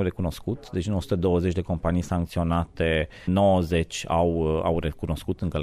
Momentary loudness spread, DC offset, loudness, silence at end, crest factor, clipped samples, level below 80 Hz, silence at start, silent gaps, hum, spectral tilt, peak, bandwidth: 8 LU; under 0.1%; -25 LUFS; 0 s; 14 dB; under 0.1%; -38 dBFS; 0 s; none; none; -7 dB/octave; -10 dBFS; 13.5 kHz